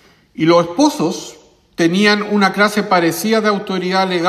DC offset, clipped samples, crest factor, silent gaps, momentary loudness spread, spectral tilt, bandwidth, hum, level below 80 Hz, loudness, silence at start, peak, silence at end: under 0.1%; under 0.1%; 14 dB; none; 8 LU; -4.5 dB/octave; 14.5 kHz; none; -58 dBFS; -15 LUFS; 0.4 s; 0 dBFS; 0 s